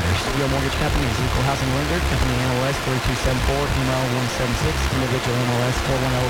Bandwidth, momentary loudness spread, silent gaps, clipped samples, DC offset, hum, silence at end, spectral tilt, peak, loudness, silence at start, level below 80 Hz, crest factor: 17.5 kHz; 1 LU; none; under 0.1%; under 0.1%; none; 0 s; -5 dB/octave; -6 dBFS; -21 LUFS; 0 s; -28 dBFS; 14 dB